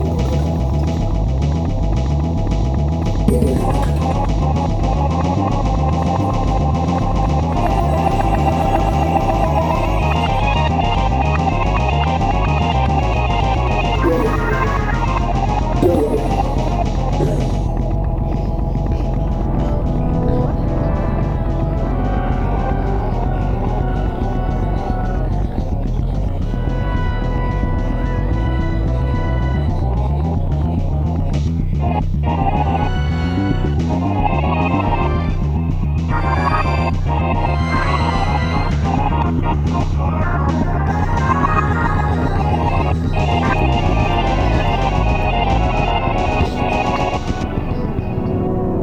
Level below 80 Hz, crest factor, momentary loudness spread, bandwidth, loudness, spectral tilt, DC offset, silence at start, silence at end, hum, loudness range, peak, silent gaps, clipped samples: -20 dBFS; 16 dB; 4 LU; 10.5 kHz; -18 LUFS; -7.5 dB/octave; under 0.1%; 0 s; 0 s; none; 3 LU; 0 dBFS; none; under 0.1%